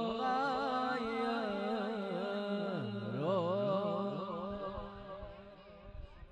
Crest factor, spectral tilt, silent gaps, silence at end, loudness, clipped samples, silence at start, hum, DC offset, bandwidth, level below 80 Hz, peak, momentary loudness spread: 16 dB; -7 dB/octave; none; 0 s; -37 LUFS; under 0.1%; 0 s; none; under 0.1%; 9.6 kHz; -58 dBFS; -20 dBFS; 19 LU